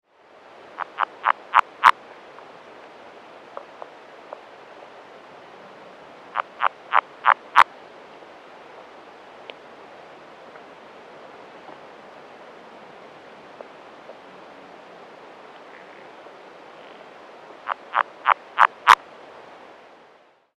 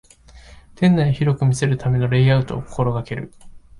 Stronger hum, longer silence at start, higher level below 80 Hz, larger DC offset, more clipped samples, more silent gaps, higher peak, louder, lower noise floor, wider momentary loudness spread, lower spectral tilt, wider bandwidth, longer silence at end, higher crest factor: neither; first, 0.8 s vs 0.35 s; second, -74 dBFS vs -44 dBFS; neither; neither; neither; first, 0 dBFS vs -6 dBFS; about the same, -20 LUFS vs -19 LUFS; first, -55 dBFS vs -45 dBFS; first, 26 LU vs 12 LU; second, -1 dB/octave vs -7 dB/octave; first, 14.5 kHz vs 11.5 kHz; first, 1.65 s vs 0.2 s; first, 28 dB vs 14 dB